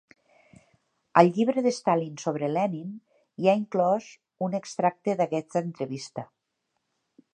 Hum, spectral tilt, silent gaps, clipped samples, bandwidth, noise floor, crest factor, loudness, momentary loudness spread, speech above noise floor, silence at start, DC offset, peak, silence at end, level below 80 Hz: none; -6.5 dB/octave; none; under 0.1%; 9.6 kHz; -79 dBFS; 24 dB; -26 LUFS; 16 LU; 54 dB; 1.15 s; under 0.1%; -2 dBFS; 1.1 s; -78 dBFS